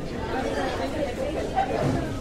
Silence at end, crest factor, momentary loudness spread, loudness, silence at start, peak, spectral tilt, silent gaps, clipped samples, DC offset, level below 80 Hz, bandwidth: 0 s; 16 dB; 4 LU; -27 LUFS; 0 s; -12 dBFS; -6 dB/octave; none; under 0.1%; under 0.1%; -38 dBFS; 15.5 kHz